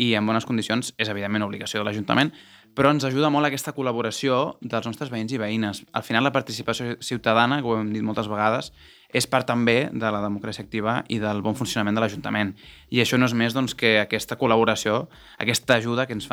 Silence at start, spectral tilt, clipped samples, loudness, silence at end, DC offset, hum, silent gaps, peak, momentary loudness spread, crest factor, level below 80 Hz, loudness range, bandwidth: 0 s; -4.5 dB/octave; under 0.1%; -23 LUFS; 0.05 s; under 0.1%; none; none; -2 dBFS; 8 LU; 20 dB; -58 dBFS; 3 LU; 17.5 kHz